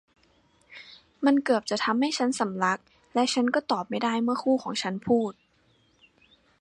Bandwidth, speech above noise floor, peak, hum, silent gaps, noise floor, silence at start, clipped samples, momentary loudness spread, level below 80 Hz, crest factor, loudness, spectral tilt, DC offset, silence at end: 11.5 kHz; 40 dB; -10 dBFS; none; none; -65 dBFS; 0.7 s; under 0.1%; 8 LU; -70 dBFS; 18 dB; -26 LUFS; -4 dB/octave; under 0.1%; 1.3 s